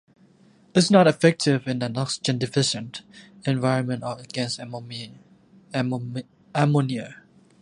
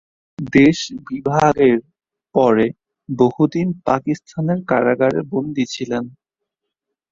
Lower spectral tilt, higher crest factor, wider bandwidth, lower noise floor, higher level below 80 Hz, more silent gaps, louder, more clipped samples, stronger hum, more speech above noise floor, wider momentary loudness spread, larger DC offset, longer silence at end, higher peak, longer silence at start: about the same, -5.5 dB/octave vs -6.5 dB/octave; first, 22 dB vs 16 dB; first, 11.5 kHz vs 7.6 kHz; second, -56 dBFS vs -80 dBFS; second, -66 dBFS vs -52 dBFS; neither; second, -23 LUFS vs -18 LUFS; neither; neither; second, 33 dB vs 63 dB; first, 18 LU vs 11 LU; neither; second, 0.45 s vs 1 s; about the same, -2 dBFS vs -2 dBFS; first, 0.75 s vs 0.4 s